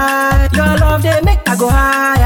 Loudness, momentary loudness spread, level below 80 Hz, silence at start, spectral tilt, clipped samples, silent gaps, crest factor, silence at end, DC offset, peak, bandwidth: -12 LUFS; 2 LU; -16 dBFS; 0 s; -5.5 dB/octave; under 0.1%; none; 10 dB; 0 s; 0.5%; 0 dBFS; 17.5 kHz